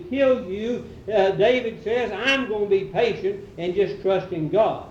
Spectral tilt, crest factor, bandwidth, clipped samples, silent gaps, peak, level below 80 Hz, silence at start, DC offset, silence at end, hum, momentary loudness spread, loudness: -6 dB/octave; 16 dB; 8 kHz; under 0.1%; none; -6 dBFS; -52 dBFS; 0 s; under 0.1%; 0 s; none; 8 LU; -23 LUFS